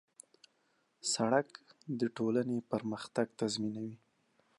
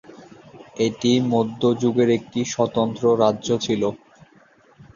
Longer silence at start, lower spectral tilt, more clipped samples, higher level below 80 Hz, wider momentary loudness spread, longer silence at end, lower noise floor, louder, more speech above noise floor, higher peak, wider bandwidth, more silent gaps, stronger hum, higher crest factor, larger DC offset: first, 1.05 s vs 0.1 s; about the same, -4.5 dB/octave vs -5.5 dB/octave; neither; second, -80 dBFS vs -58 dBFS; first, 12 LU vs 6 LU; second, 0.6 s vs 1 s; first, -76 dBFS vs -54 dBFS; second, -35 LUFS vs -21 LUFS; first, 41 dB vs 34 dB; second, -14 dBFS vs -4 dBFS; first, 11.5 kHz vs 7.4 kHz; neither; neither; about the same, 22 dB vs 18 dB; neither